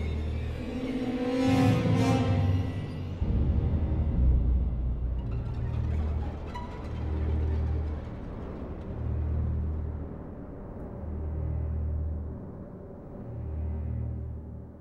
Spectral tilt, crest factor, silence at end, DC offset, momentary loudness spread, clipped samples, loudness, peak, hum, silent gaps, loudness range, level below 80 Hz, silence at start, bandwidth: -8 dB/octave; 16 dB; 0 s; under 0.1%; 15 LU; under 0.1%; -31 LUFS; -12 dBFS; none; none; 9 LU; -34 dBFS; 0 s; 9.2 kHz